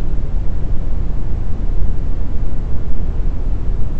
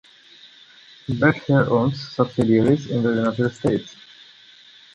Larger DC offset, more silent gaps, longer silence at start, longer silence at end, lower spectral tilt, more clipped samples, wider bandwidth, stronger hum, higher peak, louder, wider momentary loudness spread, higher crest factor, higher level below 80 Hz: neither; neither; second, 0 s vs 1.1 s; second, 0 s vs 1.05 s; first, -9.5 dB/octave vs -7.5 dB/octave; neither; second, 2.3 kHz vs 10.5 kHz; neither; first, 0 dBFS vs -4 dBFS; second, -24 LUFS vs -20 LUFS; second, 2 LU vs 9 LU; second, 10 dB vs 18 dB; first, -16 dBFS vs -54 dBFS